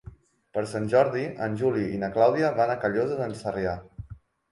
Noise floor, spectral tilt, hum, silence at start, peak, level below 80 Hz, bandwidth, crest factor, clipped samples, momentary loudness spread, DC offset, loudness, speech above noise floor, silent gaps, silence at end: -48 dBFS; -7 dB/octave; none; 0.05 s; -8 dBFS; -54 dBFS; 11.5 kHz; 18 dB; under 0.1%; 12 LU; under 0.1%; -26 LUFS; 23 dB; none; 0.35 s